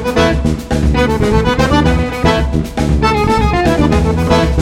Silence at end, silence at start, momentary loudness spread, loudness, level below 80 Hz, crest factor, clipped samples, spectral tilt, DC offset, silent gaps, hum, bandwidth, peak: 0 s; 0 s; 4 LU; -13 LUFS; -18 dBFS; 12 dB; under 0.1%; -6.5 dB/octave; under 0.1%; none; none; 15.5 kHz; 0 dBFS